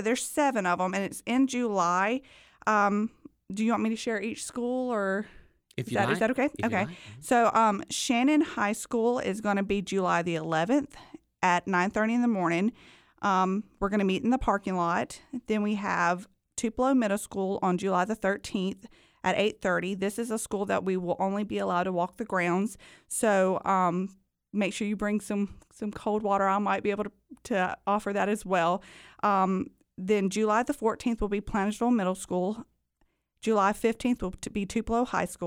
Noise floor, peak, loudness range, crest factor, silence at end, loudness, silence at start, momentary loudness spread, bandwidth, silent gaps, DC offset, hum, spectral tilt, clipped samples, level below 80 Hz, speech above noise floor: -72 dBFS; -10 dBFS; 3 LU; 18 dB; 0 s; -28 LUFS; 0 s; 9 LU; 16 kHz; none; under 0.1%; none; -5 dB/octave; under 0.1%; -54 dBFS; 45 dB